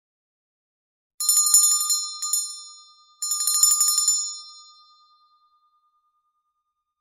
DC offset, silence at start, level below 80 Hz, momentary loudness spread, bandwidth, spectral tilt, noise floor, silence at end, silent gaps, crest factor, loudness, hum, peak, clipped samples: under 0.1%; 1.2 s; -66 dBFS; 16 LU; 16 kHz; 6 dB/octave; -79 dBFS; 2.4 s; none; 24 dB; -18 LUFS; none; -2 dBFS; under 0.1%